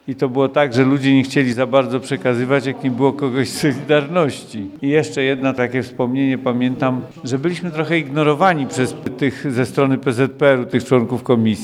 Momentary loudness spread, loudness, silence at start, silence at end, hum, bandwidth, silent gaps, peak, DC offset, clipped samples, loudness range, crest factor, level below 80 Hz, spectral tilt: 7 LU; -18 LUFS; 0.05 s; 0 s; none; 13.5 kHz; none; -2 dBFS; under 0.1%; under 0.1%; 2 LU; 16 dB; -58 dBFS; -6.5 dB/octave